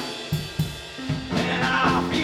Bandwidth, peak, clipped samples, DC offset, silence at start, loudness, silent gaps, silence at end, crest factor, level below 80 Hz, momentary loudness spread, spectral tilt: 17 kHz; -8 dBFS; under 0.1%; under 0.1%; 0 s; -25 LUFS; none; 0 s; 16 dB; -44 dBFS; 9 LU; -5 dB/octave